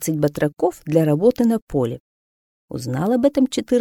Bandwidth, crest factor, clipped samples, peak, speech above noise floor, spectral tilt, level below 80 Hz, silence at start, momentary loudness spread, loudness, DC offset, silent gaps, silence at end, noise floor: 18 kHz; 16 dB; under 0.1%; -2 dBFS; over 71 dB; -6.5 dB/octave; -50 dBFS; 0 s; 10 LU; -20 LUFS; under 0.1%; 1.62-1.67 s, 2.00-2.68 s; 0 s; under -90 dBFS